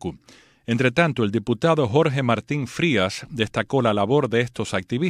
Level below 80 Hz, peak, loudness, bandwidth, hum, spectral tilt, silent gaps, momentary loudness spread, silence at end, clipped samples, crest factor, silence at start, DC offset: -56 dBFS; -4 dBFS; -22 LUFS; 13.5 kHz; none; -6 dB/octave; none; 8 LU; 0 s; under 0.1%; 18 dB; 0 s; under 0.1%